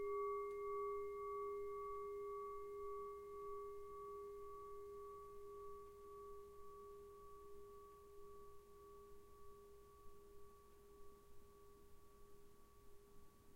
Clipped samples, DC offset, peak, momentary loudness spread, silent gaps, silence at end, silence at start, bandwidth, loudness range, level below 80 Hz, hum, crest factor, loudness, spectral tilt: under 0.1%; under 0.1%; -36 dBFS; 21 LU; none; 0 s; 0 s; 16 kHz; 17 LU; -70 dBFS; none; 16 dB; -52 LUFS; -6 dB/octave